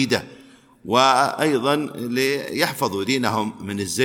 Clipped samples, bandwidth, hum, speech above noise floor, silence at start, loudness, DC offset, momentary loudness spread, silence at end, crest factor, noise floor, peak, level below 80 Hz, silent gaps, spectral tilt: under 0.1%; 19 kHz; none; 28 dB; 0 s; -21 LUFS; under 0.1%; 9 LU; 0 s; 20 dB; -49 dBFS; -2 dBFS; -62 dBFS; none; -4 dB/octave